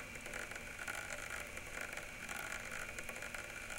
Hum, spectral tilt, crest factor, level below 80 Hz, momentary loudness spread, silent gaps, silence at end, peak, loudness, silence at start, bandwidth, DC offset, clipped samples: none; -2 dB/octave; 18 dB; -58 dBFS; 2 LU; none; 0 s; -28 dBFS; -45 LUFS; 0 s; 17 kHz; under 0.1%; under 0.1%